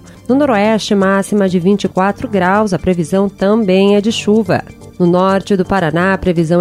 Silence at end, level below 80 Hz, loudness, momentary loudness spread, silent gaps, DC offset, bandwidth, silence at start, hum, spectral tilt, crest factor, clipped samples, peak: 0 s; -40 dBFS; -13 LUFS; 4 LU; none; under 0.1%; 13 kHz; 0.1 s; none; -6.5 dB/octave; 12 dB; under 0.1%; 0 dBFS